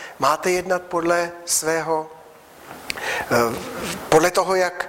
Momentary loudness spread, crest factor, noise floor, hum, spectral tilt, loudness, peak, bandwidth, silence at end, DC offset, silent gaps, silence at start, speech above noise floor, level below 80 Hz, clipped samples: 11 LU; 16 dB; -45 dBFS; none; -3 dB/octave; -21 LUFS; -6 dBFS; 16.5 kHz; 0 s; under 0.1%; none; 0 s; 24 dB; -54 dBFS; under 0.1%